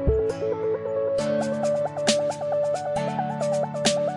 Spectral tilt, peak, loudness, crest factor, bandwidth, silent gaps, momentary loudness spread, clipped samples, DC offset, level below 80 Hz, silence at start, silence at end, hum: -4.5 dB/octave; -8 dBFS; -25 LUFS; 18 dB; 11.5 kHz; none; 4 LU; under 0.1%; under 0.1%; -40 dBFS; 0 s; 0 s; none